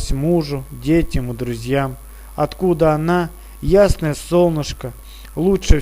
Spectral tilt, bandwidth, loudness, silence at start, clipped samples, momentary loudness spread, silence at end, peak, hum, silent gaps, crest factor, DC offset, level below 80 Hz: -6.5 dB/octave; 16 kHz; -18 LUFS; 0 s; under 0.1%; 15 LU; 0 s; 0 dBFS; none; none; 18 dB; under 0.1%; -24 dBFS